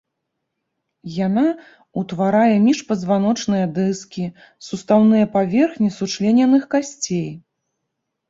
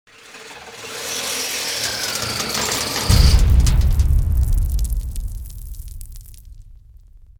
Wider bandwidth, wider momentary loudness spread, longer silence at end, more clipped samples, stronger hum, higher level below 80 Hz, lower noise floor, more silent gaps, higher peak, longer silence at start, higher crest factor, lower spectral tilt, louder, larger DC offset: second, 7.8 kHz vs over 20 kHz; second, 16 LU vs 22 LU; first, 0.9 s vs 0.25 s; neither; neither; second, -60 dBFS vs -20 dBFS; first, -77 dBFS vs -44 dBFS; neither; second, -4 dBFS vs 0 dBFS; first, 1.05 s vs 0.3 s; about the same, 16 dB vs 18 dB; first, -6 dB/octave vs -3.5 dB/octave; about the same, -18 LUFS vs -19 LUFS; neither